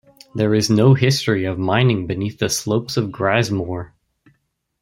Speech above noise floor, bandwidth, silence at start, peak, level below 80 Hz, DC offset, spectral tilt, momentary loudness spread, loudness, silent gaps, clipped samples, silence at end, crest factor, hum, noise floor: 49 dB; 16 kHz; 0.35 s; -2 dBFS; -52 dBFS; under 0.1%; -5.5 dB/octave; 11 LU; -18 LUFS; none; under 0.1%; 0.95 s; 18 dB; none; -67 dBFS